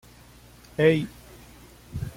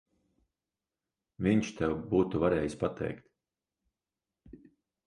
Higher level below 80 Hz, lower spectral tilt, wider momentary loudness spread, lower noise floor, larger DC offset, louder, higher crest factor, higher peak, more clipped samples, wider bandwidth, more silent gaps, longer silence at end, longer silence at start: first, -50 dBFS vs -56 dBFS; about the same, -7 dB/octave vs -7 dB/octave; first, 19 LU vs 10 LU; second, -51 dBFS vs under -90 dBFS; neither; first, -25 LUFS vs -31 LUFS; about the same, 20 dB vs 20 dB; first, -8 dBFS vs -14 dBFS; neither; first, 16.5 kHz vs 11 kHz; neither; second, 0.05 s vs 0.55 s; second, 0.8 s vs 1.4 s